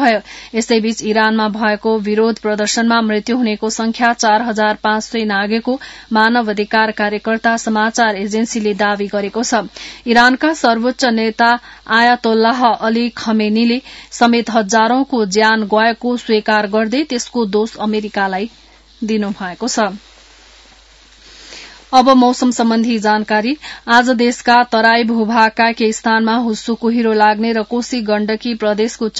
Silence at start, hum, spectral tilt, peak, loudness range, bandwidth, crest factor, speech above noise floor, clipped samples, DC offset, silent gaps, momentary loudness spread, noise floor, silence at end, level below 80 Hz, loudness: 0 s; none; -4 dB/octave; 0 dBFS; 5 LU; 8 kHz; 14 dB; 30 dB; under 0.1%; under 0.1%; none; 8 LU; -45 dBFS; 0 s; -50 dBFS; -14 LUFS